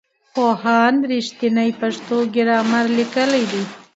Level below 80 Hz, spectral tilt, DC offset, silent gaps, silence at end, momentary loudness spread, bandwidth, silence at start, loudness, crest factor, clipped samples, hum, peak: -68 dBFS; -5 dB/octave; under 0.1%; none; 0.15 s; 7 LU; 8 kHz; 0.35 s; -18 LUFS; 16 dB; under 0.1%; none; -2 dBFS